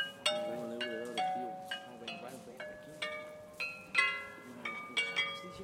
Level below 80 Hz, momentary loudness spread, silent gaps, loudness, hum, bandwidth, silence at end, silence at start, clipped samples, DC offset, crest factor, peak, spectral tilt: -76 dBFS; 15 LU; none; -37 LUFS; none; 16 kHz; 0 s; 0 s; under 0.1%; under 0.1%; 24 dB; -14 dBFS; -2 dB/octave